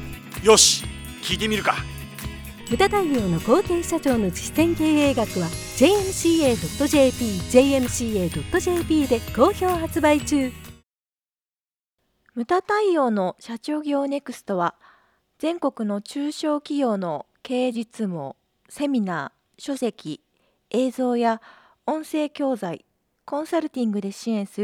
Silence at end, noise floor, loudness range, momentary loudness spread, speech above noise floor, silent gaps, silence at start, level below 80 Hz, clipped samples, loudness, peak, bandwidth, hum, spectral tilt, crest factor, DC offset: 0 s; under -90 dBFS; 7 LU; 14 LU; over 68 dB; 11.05-11.09 s; 0 s; -44 dBFS; under 0.1%; -22 LUFS; -2 dBFS; over 20 kHz; none; -4 dB/octave; 20 dB; under 0.1%